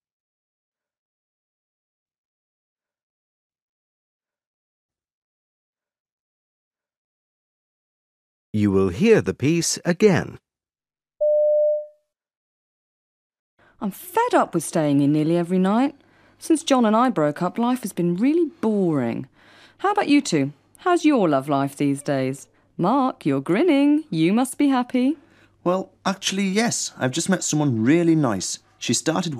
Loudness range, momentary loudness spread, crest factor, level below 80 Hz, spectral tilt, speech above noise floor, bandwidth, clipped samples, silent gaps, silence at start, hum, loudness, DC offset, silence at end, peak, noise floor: 5 LU; 9 LU; 20 dB; -64 dBFS; -5 dB/octave; over 70 dB; 15.5 kHz; under 0.1%; 12.37-13.30 s, 13.39-13.57 s; 8.55 s; none; -21 LUFS; under 0.1%; 0 s; -4 dBFS; under -90 dBFS